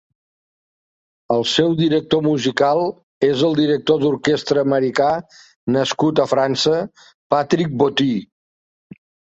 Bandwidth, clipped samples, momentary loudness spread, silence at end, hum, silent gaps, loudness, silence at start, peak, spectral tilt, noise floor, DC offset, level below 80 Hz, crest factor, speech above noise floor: 8 kHz; under 0.1%; 5 LU; 1.1 s; none; 3.03-3.21 s, 5.56-5.67 s, 7.14-7.30 s; -18 LUFS; 1.3 s; -2 dBFS; -5.5 dB/octave; under -90 dBFS; under 0.1%; -58 dBFS; 18 dB; over 73 dB